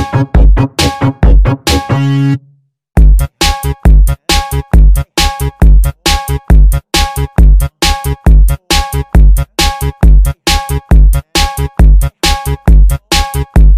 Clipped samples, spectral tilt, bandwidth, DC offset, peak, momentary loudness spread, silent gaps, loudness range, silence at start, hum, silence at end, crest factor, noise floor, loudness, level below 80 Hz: 3%; -4.5 dB/octave; 15.5 kHz; under 0.1%; 0 dBFS; 4 LU; none; 1 LU; 0 s; none; 0 s; 8 dB; -47 dBFS; -11 LUFS; -8 dBFS